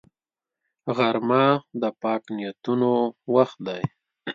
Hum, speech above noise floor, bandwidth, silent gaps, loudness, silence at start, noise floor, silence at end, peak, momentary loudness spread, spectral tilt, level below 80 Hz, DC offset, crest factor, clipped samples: none; over 67 dB; 7.2 kHz; none; -24 LUFS; 0.85 s; under -90 dBFS; 0 s; -4 dBFS; 12 LU; -8 dB/octave; -68 dBFS; under 0.1%; 20 dB; under 0.1%